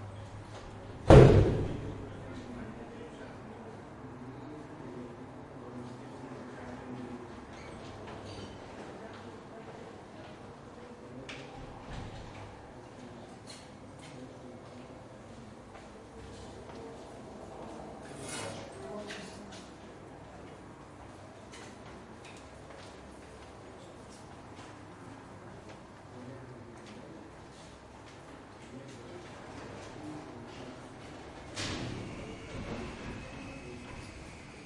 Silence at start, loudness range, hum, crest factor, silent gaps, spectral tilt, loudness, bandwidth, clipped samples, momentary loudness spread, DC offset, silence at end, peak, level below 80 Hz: 0 s; 7 LU; none; 32 dB; none; -7 dB/octave; -33 LUFS; 11.5 kHz; under 0.1%; 9 LU; under 0.1%; 0 s; -4 dBFS; -46 dBFS